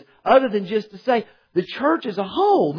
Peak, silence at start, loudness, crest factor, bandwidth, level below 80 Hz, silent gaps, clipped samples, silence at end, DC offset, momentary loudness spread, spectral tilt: -4 dBFS; 0.25 s; -21 LUFS; 16 dB; 5.4 kHz; -60 dBFS; none; under 0.1%; 0 s; under 0.1%; 9 LU; -7.5 dB/octave